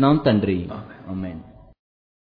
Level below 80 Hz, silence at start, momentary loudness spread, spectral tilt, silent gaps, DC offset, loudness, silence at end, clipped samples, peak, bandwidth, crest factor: -48 dBFS; 0 s; 18 LU; -11 dB/octave; none; under 0.1%; -23 LUFS; 0.8 s; under 0.1%; -4 dBFS; 5 kHz; 18 dB